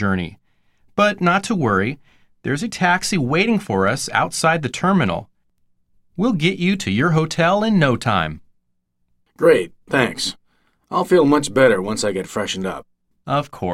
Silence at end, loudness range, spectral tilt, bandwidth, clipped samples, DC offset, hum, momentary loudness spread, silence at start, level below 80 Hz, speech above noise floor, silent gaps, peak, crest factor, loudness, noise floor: 0 s; 2 LU; -5 dB/octave; 15 kHz; under 0.1%; under 0.1%; none; 10 LU; 0 s; -50 dBFS; 50 dB; none; 0 dBFS; 20 dB; -19 LUFS; -68 dBFS